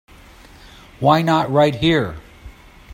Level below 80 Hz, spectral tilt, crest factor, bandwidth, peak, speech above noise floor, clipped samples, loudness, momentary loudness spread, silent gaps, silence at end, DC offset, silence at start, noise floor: -44 dBFS; -6.5 dB/octave; 18 dB; 16.5 kHz; 0 dBFS; 28 dB; under 0.1%; -17 LUFS; 10 LU; none; 0 s; under 0.1%; 1 s; -44 dBFS